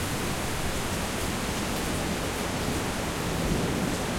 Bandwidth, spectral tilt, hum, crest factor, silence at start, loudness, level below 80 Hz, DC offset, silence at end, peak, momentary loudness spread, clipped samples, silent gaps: 16.5 kHz; -4 dB/octave; none; 14 dB; 0 s; -29 LUFS; -40 dBFS; under 0.1%; 0 s; -14 dBFS; 2 LU; under 0.1%; none